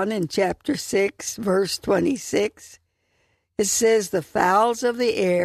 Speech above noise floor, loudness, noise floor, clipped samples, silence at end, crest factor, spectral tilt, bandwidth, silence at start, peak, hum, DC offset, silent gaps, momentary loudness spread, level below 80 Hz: 46 dB; -22 LUFS; -68 dBFS; under 0.1%; 0 s; 18 dB; -3.5 dB/octave; 14 kHz; 0 s; -4 dBFS; none; under 0.1%; none; 7 LU; -56 dBFS